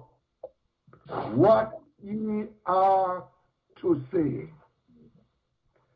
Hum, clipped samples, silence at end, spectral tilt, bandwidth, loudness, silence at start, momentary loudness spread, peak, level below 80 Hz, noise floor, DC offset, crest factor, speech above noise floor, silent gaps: none; under 0.1%; 1.45 s; -10 dB/octave; 5.6 kHz; -26 LUFS; 0.45 s; 17 LU; -10 dBFS; -62 dBFS; -73 dBFS; under 0.1%; 20 dB; 48 dB; none